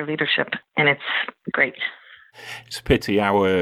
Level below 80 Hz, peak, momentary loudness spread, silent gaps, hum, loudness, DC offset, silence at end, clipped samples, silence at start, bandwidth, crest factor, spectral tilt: -44 dBFS; -4 dBFS; 14 LU; none; none; -21 LUFS; under 0.1%; 0 s; under 0.1%; 0 s; 15 kHz; 18 dB; -5 dB/octave